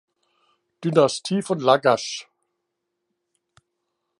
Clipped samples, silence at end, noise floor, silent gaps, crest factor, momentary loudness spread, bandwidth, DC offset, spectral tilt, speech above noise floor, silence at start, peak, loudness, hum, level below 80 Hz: under 0.1%; 1.95 s; -79 dBFS; none; 22 dB; 12 LU; 11.5 kHz; under 0.1%; -5 dB/octave; 59 dB; 0.8 s; -2 dBFS; -21 LUFS; none; -72 dBFS